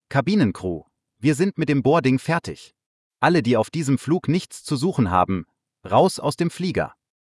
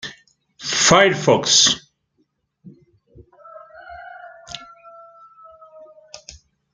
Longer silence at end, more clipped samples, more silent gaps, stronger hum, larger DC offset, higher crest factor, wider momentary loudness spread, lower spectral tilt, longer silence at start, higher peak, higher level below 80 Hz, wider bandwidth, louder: about the same, 0.45 s vs 0.55 s; neither; first, 2.86-3.11 s vs none; neither; neither; about the same, 18 dB vs 22 dB; second, 11 LU vs 27 LU; first, -6.5 dB/octave vs -2 dB/octave; about the same, 0.1 s vs 0.05 s; about the same, -4 dBFS vs -2 dBFS; about the same, -56 dBFS vs -56 dBFS; first, 12 kHz vs 10.5 kHz; second, -21 LUFS vs -14 LUFS